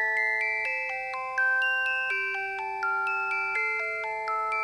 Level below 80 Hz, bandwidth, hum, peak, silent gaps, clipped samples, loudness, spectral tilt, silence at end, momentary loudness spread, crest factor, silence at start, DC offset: -68 dBFS; 13.5 kHz; none; -16 dBFS; none; under 0.1%; -27 LUFS; -1.5 dB/octave; 0 s; 6 LU; 12 dB; 0 s; under 0.1%